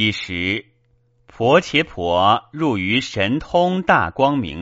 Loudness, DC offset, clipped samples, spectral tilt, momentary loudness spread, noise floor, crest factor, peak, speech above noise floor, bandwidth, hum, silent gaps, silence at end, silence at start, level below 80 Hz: -18 LUFS; under 0.1%; under 0.1%; -3 dB/octave; 6 LU; -60 dBFS; 18 dB; 0 dBFS; 42 dB; 8 kHz; none; none; 0 s; 0 s; -46 dBFS